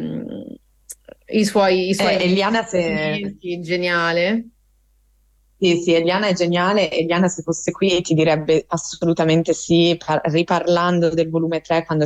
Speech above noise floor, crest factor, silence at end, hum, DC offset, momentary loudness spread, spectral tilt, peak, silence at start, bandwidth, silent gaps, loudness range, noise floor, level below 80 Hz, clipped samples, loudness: 41 dB; 12 dB; 0 s; none; under 0.1%; 10 LU; -5 dB/octave; -6 dBFS; 0 s; 12.5 kHz; none; 3 LU; -59 dBFS; -54 dBFS; under 0.1%; -18 LUFS